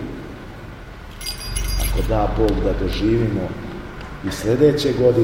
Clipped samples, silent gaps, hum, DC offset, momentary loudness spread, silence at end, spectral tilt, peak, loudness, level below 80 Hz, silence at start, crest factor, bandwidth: under 0.1%; none; none; under 0.1%; 20 LU; 0 s; -6 dB/octave; -2 dBFS; -20 LUFS; -28 dBFS; 0 s; 18 dB; 16.5 kHz